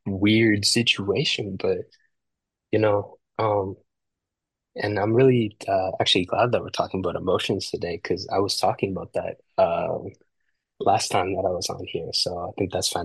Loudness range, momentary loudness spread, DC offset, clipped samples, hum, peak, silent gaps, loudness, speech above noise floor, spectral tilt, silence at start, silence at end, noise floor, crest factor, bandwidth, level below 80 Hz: 4 LU; 11 LU; under 0.1%; under 0.1%; none; -4 dBFS; none; -23 LUFS; 62 dB; -4.5 dB/octave; 0.05 s; 0 s; -85 dBFS; 20 dB; 12.5 kHz; -64 dBFS